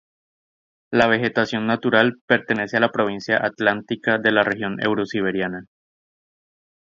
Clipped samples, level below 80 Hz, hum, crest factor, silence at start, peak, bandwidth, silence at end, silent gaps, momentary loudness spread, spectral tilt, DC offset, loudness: under 0.1%; -60 dBFS; none; 22 dB; 0.9 s; 0 dBFS; 7.6 kHz; 1.2 s; 2.21-2.28 s; 6 LU; -6 dB/octave; under 0.1%; -20 LUFS